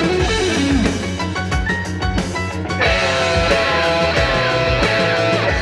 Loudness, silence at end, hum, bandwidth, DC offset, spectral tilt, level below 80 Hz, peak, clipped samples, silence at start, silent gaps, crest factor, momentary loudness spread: -17 LUFS; 0 s; none; 12.5 kHz; under 0.1%; -4.5 dB/octave; -28 dBFS; -2 dBFS; under 0.1%; 0 s; none; 14 dB; 6 LU